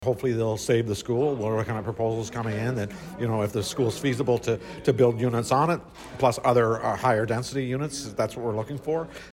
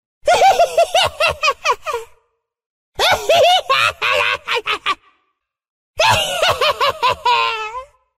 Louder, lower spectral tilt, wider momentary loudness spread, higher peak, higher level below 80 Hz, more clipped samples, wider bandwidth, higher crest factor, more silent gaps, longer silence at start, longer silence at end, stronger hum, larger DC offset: second, -26 LUFS vs -15 LUFS; first, -6 dB/octave vs -1 dB/octave; second, 8 LU vs 13 LU; second, -8 dBFS vs -2 dBFS; second, -54 dBFS vs -46 dBFS; neither; about the same, 16 kHz vs 16 kHz; about the same, 18 dB vs 14 dB; second, none vs 2.66-2.92 s, 5.70-5.94 s; second, 0 s vs 0.25 s; second, 0.05 s vs 0.35 s; neither; neither